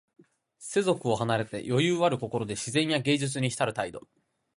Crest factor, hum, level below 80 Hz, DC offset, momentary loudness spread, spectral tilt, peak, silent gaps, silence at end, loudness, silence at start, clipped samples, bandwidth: 18 dB; none; -64 dBFS; under 0.1%; 8 LU; -5 dB/octave; -10 dBFS; none; 0.55 s; -28 LUFS; 0.6 s; under 0.1%; 11.5 kHz